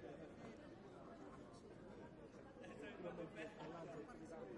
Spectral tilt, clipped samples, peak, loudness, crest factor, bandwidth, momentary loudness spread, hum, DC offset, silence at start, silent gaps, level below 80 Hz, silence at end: -6 dB/octave; under 0.1%; -40 dBFS; -56 LUFS; 16 dB; 11 kHz; 7 LU; none; under 0.1%; 0 s; none; -76 dBFS; 0 s